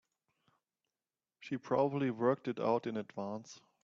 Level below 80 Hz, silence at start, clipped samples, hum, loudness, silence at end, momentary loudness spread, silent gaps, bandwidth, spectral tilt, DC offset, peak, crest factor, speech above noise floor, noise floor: -80 dBFS; 1.4 s; under 0.1%; none; -36 LUFS; 0.25 s; 13 LU; none; 7.6 kHz; -7 dB/octave; under 0.1%; -18 dBFS; 20 dB; over 55 dB; under -90 dBFS